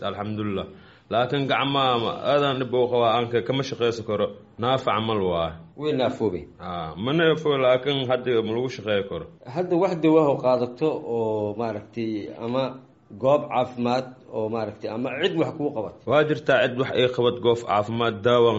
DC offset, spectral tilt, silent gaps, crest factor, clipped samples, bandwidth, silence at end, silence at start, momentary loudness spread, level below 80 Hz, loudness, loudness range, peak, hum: under 0.1%; -4 dB/octave; none; 18 dB; under 0.1%; 8 kHz; 0 s; 0 s; 10 LU; -58 dBFS; -24 LUFS; 3 LU; -6 dBFS; none